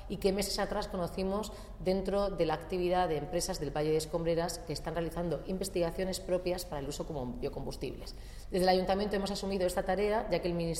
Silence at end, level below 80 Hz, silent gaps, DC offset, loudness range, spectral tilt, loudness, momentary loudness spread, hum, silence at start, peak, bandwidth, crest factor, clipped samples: 0 s; -46 dBFS; none; under 0.1%; 3 LU; -5 dB/octave; -34 LUFS; 8 LU; none; 0 s; -16 dBFS; 16 kHz; 18 dB; under 0.1%